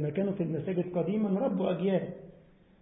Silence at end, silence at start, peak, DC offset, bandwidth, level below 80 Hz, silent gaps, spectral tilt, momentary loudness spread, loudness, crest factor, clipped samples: 0.5 s; 0 s; -18 dBFS; under 0.1%; 3.9 kHz; -66 dBFS; none; -12 dB/octave; 4 LU; -31 LUFS; 14 dB; under 0.1%